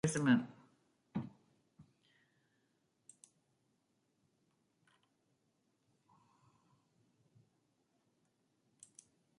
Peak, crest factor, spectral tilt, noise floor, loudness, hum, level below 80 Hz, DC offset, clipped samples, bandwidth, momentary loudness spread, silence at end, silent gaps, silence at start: -18 dBFS; 26 dB; -5.5 dB/octave; -81 dBFS; -36 LUFS; none; -78 dBFS; under 0.1%; under 0.1%; 11 kHz; 28 LU; 7.55 s; none; 0.05 s